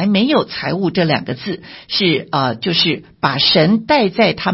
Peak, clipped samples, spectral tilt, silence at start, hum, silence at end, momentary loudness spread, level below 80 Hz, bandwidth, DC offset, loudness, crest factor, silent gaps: 0 dBFS; under 0.1%; -8.5 dB/octave; 0 s; none; 0 s; 8 LU; -50 dBFS; 5.8 kHz; under 0.1%; -15 LUFS; 16 dB; none